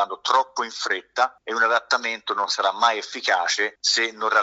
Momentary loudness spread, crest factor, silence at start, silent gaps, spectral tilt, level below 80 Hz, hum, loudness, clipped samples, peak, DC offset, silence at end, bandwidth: 5 LU; 20 dB; 0 s; none; 1 dB/octave; -76 dBFS; none; -22 LUFS; under 0.1%; -4 dBFS; under 0.1%; 0 s; 8 kHz